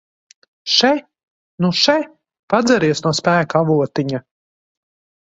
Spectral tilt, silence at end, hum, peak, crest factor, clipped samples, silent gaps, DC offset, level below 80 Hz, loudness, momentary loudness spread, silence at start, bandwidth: -4.5 dB/octave; 1 s; none; 0 dBFS; 18 dB; under 0.1%; 1.23-1.58 s, 2.39-2.48 s; under 0.1%; -58 dBFS; -16 LUFS; 10 LU; 0.65 s; 8 kHz